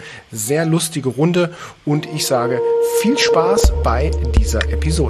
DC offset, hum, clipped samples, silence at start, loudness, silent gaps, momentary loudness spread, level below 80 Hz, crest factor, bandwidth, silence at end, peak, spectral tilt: under 0.1%; none; under 0.1%; 0 s; -17 LUFS; none; 7 LU; -22 dBFS; 14 dB; 14 kHz; 0 s; -2 dBFS; -5 dB/octave